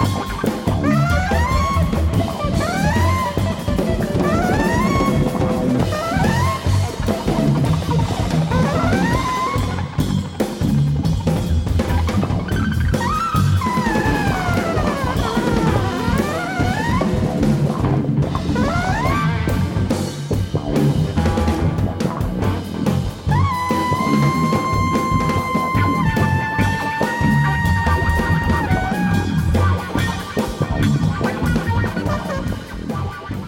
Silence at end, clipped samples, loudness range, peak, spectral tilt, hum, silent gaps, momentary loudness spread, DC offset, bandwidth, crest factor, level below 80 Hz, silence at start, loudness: 0 s; under 0.1%; 2 LU; -6 dBFS; -6.5 dB/octave; none; none; 4 LU; under 0.1%; 17 kHz; 12 dB; -28 dBFS; 0 s; -19 LUFS